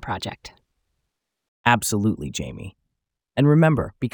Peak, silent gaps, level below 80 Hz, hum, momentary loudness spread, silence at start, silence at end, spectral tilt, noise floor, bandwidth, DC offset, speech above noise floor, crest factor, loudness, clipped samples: -2 dBFS; 1.48-1.64 s; -50 dBFS; none; 20 LU; 0 s; 0.05 s; -5.5 dB/octave; -80 dBFS; over 20 kHz; under 0.1%; 59 dB; 22 dB; -21 LUFS; under 0.1%